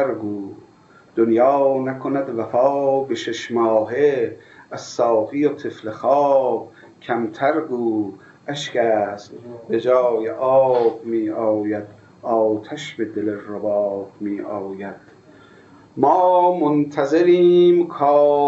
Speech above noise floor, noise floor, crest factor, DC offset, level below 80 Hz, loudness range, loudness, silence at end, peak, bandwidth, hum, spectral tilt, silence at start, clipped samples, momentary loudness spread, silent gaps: 29 dB; -47 dBFS; 18 dB; under 0.1%; -70 dBFS; 6 LU; -19 LUFS; 0 s; -2 dBFS; 7.8 kHz; none; -6.5 dB/octave; 0 s; under 0.1%; 15 LU; none